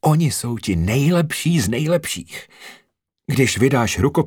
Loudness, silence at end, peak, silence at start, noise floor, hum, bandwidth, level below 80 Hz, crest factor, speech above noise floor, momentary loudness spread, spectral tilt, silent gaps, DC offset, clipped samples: -19 LUFS; 0 s; -2 dBFS; 0.05 s; -50 dBFS; none; 19 kHz; -42 dBFS; 16 dB; 32 dB; 15 LU; -5.5 dB/octave; none; under 0.1%; under 0.1%